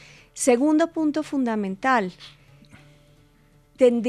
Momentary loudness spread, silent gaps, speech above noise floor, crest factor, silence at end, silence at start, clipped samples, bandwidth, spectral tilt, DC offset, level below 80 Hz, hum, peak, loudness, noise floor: 6 LU; none; 36 dB; 18 dB; 0 s; 0.35 s; under 0.1%; 13.5 kHz; -4.5 dB/octave; under 0.1%; -62 dBFS; none; -6 dBFS; -22 LUFS; -57 dBFS